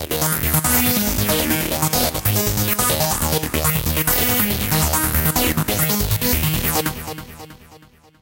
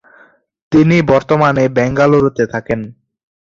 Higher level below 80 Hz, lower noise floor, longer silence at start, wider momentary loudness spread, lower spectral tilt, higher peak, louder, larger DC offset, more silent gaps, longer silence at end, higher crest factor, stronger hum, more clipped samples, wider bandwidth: first, -32 dBFS vs -44 dBFS; about the same, -48 dBFS vs -48 dBFS; second, 0 s vs 0.7 s; second, 4 LU vs 10 LU; second, -3.5 dB/octave vs -7.5 dB/octave; about the same, -2 dBFS vs 0 dBFS; second, -17 LUFS vs -13 LUFS; neither; neither; second, 0.45 s vs 0.6 s; about the same, 18 dB vs 14 dB; neither; neither; first, 18 kHz vs 7.6 kHz